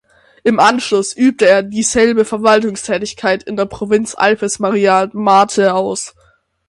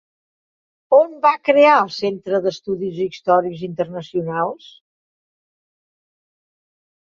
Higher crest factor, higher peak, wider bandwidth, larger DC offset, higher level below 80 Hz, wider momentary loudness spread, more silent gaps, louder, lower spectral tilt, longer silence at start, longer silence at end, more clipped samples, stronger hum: about the same, 14 dB vs 18 dB; about the same, 0 dBFS vs -2 dBFS; first, 11.5 kHz vs 7 kHz; neither; first, -50 dBFS vs -66 dBFS; second, 8 LU vs 12 LU; neither; first, -14 LUFS vs -18 LUFS; second, -3.5 dB/octave vs -6 dB/octave; second, 0.45 s vs 0.9 s; second, 0.6 s vs 2.5 s; neither; neither